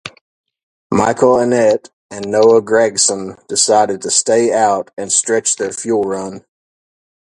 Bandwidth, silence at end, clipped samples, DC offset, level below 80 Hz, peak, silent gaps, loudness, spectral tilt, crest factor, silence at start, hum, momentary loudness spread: 11.5 kHz; 0.8 s; under 0.1%; under 0.1%; -54 dBFS; 0 dBFS; 0.21-0.44 s, 0.63-0.90 s, 1.93-2.09 s; -14 LUFS; -3 dB/octave; 16 dB; 0.05 s; none; 10 LU